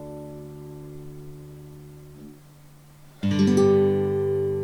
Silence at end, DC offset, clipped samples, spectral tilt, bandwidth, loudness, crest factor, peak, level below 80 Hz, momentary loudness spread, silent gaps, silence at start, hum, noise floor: 0 s; under 0.1%; under 0.1%; -7.5 dB/octave; 13.5 kHz; -21 LUFS; 16 dB; -8 dBFS; -56 dBFS; 26 LU; none; 0 s; none; -49 dBFS